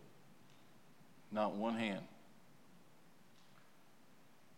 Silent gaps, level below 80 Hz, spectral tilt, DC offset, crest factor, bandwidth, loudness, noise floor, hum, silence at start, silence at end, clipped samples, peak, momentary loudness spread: none; under -90 dBFS; -6 dB/octave; under 0.1%; 24 dB; 16.5 kHz; -41 LUFS; -68 dBFS; none; 0 s; 2.45 s; under 0.1%; -24 dBFS; 27 LU